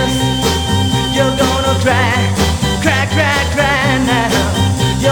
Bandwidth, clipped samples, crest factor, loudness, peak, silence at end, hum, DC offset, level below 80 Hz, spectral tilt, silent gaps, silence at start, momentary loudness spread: 20 kHz; under 0.1%; 14 dB; -13 LUFS; 0 dBFS; 0 s; none; under 0.1%; -26 dBFS; -4.5 dB/octave; none; 0 s; 2 LU